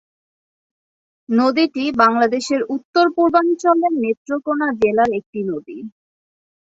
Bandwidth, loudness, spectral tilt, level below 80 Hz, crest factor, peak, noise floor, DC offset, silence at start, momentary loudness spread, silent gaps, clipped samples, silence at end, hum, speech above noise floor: 8 kHz; -17 LUFS; -5 dB/octave; -58 dBFS; 18 dB; -2 dBFS; under -90 dBFS; under 0.1%; 1.3 s; 10 LU; 2.85-2.93 s, 4.17-4.25 s, 5.26-5.33 s; under 0.1%; 0.75 s; none; over 73 dB